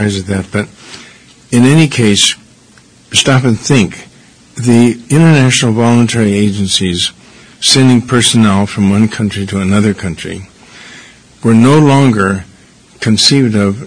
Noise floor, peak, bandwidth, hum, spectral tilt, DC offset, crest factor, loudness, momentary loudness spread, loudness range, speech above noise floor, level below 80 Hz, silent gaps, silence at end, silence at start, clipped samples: -43 dBFS; 0 dBFS; 11 kHz; none; -4.5 dB/octave; under 0.1%; 10 dB; -10 LUFS; 12 LU; 3 LU; 33 dB; -44 dBFS; none; 0 s; 0 s; 0.9%